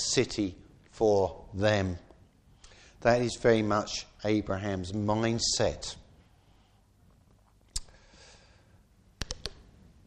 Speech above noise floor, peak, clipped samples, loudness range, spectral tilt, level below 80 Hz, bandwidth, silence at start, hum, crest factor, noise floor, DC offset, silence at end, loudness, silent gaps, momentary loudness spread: 34 dB; -10 dBFS; under 0.1%; 17 LU; -4.5 dB/octave; -52 dBFS; 12.5 kHz; 0 s; none; 22 dB; -63 dBFS; under 0.1%; 0.55 s; -30 LUFS; none; 14 LU